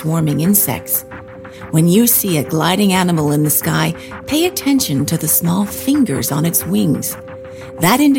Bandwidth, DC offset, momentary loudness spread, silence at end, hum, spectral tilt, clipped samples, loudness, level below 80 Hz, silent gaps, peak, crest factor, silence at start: 17 kHz; under 0.1%; 16 LU; 0 s; none; -4.5 dB/octave; under 0.1%; -15 LUFS; -48 dBFS; none; 0 dBFS; 16 dB; 0 s